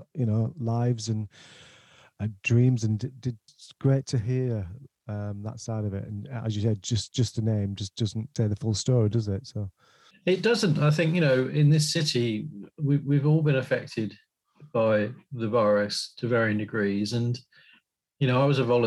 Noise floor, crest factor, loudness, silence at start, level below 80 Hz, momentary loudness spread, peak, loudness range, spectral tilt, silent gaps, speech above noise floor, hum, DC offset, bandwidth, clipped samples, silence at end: -64 dBFS; 16 dB; -26 LUFS; 0 s; -62 dBFS; 13 LU; -10 dBFS; 6 LU; -6 dB/octave; none; 38 dB; none; under 0.1%; 12 kHz; under 0.1%; 0 s